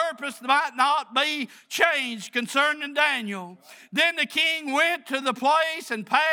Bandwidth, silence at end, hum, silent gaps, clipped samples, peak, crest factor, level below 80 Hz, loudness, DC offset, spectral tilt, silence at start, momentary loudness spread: over 20 kHz; 0 s; none; none; under 0.1%; -4 dBFS; 20 dB; -88 dBFS; -23 LUFS; under 0.1%; -2 dB/octave; 0 s; 9 LU